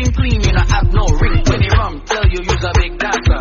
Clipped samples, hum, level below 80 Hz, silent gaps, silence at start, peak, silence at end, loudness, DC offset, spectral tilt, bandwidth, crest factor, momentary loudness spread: under 0.1%; none; -16 dBFS; none; 0 s; 0 dBFS; 0 s; -15 LUFS; under 0.1%; -5 dB/octave; 7.4 kHz; 12 dB; 3 LU